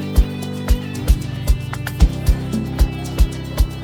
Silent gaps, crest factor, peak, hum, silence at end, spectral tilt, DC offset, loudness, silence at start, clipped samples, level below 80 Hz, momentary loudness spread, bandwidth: none; 16 dB; -2 dBFS; none; 0 s; -6 dB/octave; under 0.1%; -21 LUFS; 0 s; under 0.1%; -18 dBFS; 4 LU; 17 kHz